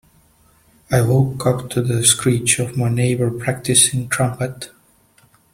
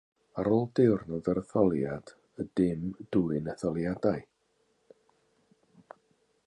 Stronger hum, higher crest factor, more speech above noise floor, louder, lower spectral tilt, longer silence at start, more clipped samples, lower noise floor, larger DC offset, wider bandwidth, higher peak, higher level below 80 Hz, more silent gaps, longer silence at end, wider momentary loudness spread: neither; about the same, 20 dB vs 20 dB; second, 37 dB vs 44 dB; first, -17 LUFS vs -30 LUFS; second, -4 dB/octave vs -9 dB/octave; first, 0.9 s vs 0.35 s; neither; second, -55 dBFS vs -73 dBFS; neither; first, 16 kHz vs 10.5 kHz; first, 0 dBFS vs -12 dBFS; first, -48 dBFS vs -58 dBFS; neither; second, 0.85 s vs 2.25 s; about the same, 10 LU vs 12 LU